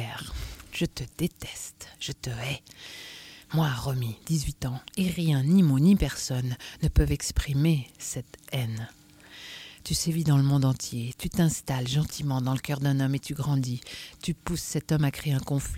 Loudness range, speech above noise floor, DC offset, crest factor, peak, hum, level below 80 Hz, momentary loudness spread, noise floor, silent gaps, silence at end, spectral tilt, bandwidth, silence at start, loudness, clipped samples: 7 LU; 21 dB; under 0.1%; 18 dB; -8 dBFS; none; -40 dBFS; 17 LU; -48 dBFS; none; 0 s; -5.5 dB/octave; 16.5 kHz; 0 s; -28 LUFS; under 0.1%